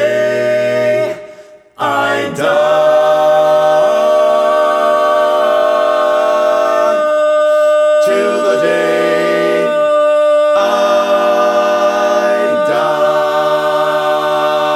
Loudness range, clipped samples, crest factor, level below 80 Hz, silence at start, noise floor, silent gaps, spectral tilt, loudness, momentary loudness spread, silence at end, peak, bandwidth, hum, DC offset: 2 LU; under 0.1%; 10 dB; -58 dBFS; 0 s; -37 dBFS; none; -4 dB/octave; -12 LUFS; 3 LU; 0 s; -2 dBFS; 13.5 kHz; none; under 0.1%